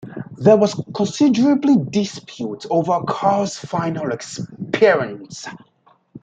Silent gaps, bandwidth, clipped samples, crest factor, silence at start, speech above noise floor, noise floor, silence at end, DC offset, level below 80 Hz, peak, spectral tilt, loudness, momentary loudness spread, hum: none; 9.2 kHz; under 0.1%; 16 dB; 0.05 s; 39 dB; -57 dBFS; 0.05 s; under 0.1%; -60 dBFS; -2 dBFS; -6 dB/octave; -18 LUFS; 16 LU; none